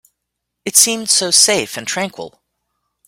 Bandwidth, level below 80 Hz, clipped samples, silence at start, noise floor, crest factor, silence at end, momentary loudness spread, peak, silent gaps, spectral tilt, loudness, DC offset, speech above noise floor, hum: over 20 kHz; -62 dBFS; under 0.1%; 0.65 s; -77 dBFS; 18 dB; 0.8 s; 15 LU; 0 dBFS; none; -0.5 dB/octave; -12 LUFS; under 0.1%; 62 dB; 60 Hz at -50 dBFS